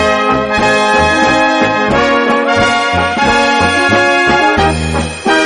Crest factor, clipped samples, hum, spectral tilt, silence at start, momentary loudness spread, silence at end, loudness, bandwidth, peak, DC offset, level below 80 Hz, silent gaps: 10 dB; under 0.1%; none; -4 dB/octave; 0 s; 3 LU; 0 s; -10 LUFS; 11.5 kHz; 0 dBFS; under 0.1%; -30 dBFS; none